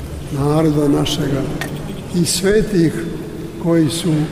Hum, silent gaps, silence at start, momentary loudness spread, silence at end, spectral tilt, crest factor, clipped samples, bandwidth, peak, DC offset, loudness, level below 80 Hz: none; none; 0 s; 11 LU; 0 s; -5.5 dB/octave; 14 dB; under 0.1%; 16 kHz; -4 dBFS; under 0.1%; -17 LUFS; -34 dBFS